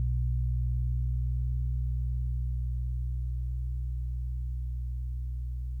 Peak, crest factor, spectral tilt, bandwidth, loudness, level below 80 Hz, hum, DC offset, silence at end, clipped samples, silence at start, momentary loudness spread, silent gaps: -22 dBFS; 8 dB; -10 dB/octave; 0.3 kHz; -34 LUFS; -32 dBFS; none; under 0.1%; 0 s; under 0.1%; 0 s; 6 LU; none